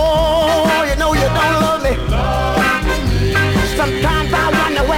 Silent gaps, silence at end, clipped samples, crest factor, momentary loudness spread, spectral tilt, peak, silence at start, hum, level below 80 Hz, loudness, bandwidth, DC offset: none; 0 s; under 0.1%; 12 dB; 3 LU; -5 dB/octave; -2 dBFS; 0 s; none; -22 dBFS; -15 LUFS; 17 kHz; under 0.1%